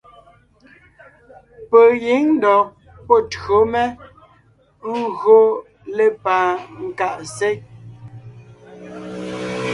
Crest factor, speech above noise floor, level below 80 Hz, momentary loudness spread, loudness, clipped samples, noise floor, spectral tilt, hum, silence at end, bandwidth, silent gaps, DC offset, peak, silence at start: 18 dB; 39 dB; -52 dBFS; 19 LU; -17 LUFS; under 0.1%; -55 dBFS; -5.5 dB/octave; none; 0 s; 11 kHz; none; under 0.1%; 0 dBFS; 1.6 s